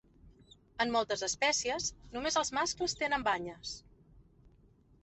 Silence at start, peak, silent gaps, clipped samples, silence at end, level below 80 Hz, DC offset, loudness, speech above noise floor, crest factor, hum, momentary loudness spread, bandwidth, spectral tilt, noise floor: 0.25 s; -16 dBFS; none; under 0.1%; 0.8 s; -60 dBFS; under 0.1%; -33 LUFS; 30 dB; 20 dB; none; 13 LU; 8.4 kHz; -1.5 dB/octave; -64 dBFS